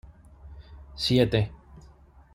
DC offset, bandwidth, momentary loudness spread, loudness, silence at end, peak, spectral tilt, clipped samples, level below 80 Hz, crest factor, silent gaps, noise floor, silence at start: under 0.1%; 16 kHz; 25 LU; -25 LUFS; 0.55 s; -8 dBFS; -6.5 dB/octave; under 0.1%; -46 dBFS; 22 dB; none; -53 dBFS; 0.45 s